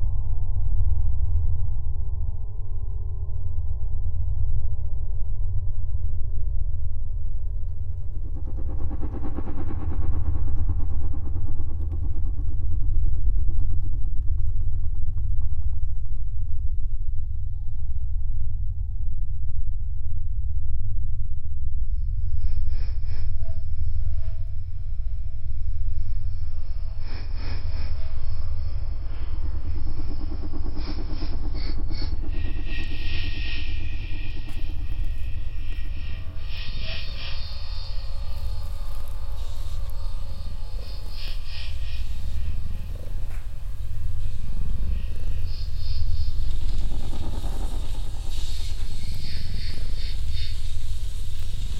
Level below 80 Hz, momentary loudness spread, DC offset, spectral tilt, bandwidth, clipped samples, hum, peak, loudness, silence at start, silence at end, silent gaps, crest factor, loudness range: -26 dBFS; 6 LU; under 0.1%; -6 dB/octave; 5.6 kHz; under 0.1%; none; -6 dBFS; -32 LUFS; 0 s; 0 s; none; 12 dB; 5 LU